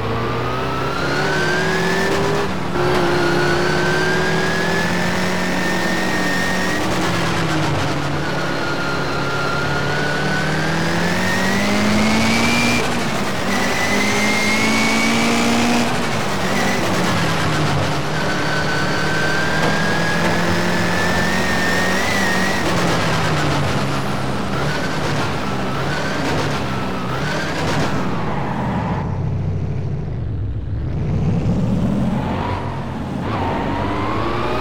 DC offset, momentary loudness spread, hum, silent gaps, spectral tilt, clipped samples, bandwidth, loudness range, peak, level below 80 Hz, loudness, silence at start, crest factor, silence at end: 6%; 6 LU; none; none; -4.5 dB/octave; under 0.1%; 19 kHz; 5 LU; -6 dBFS; -36 dBFS; -19 LUFS; 0 s; 12 dB; 0 s